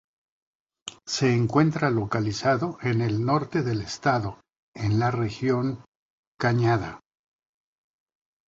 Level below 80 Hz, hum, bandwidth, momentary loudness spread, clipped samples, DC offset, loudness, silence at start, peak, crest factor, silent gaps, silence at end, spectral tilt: -54 dBFS; none; 7.8 kHz; 10 LU; under 0.1%; under 0.1%; -25 LUFS; 0.85 s; -6 dBFS; 20 dB; 4.59-4.72 s, 5.88-6.35 s; 1.5 s; -6.5 dB/octave